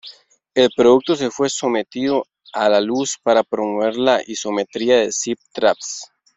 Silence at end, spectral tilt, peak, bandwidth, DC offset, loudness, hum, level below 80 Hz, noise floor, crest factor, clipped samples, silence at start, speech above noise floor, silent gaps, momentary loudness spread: 0.3 s; -3 dB/octave; 0 dBFS; 8.2 kHz; under 0.1%; -18 LUFS; none; -62 dBFS; -44 dBFS; 18 dB; under 0.1%; 0.05 s; 26 dB; none; 9 LU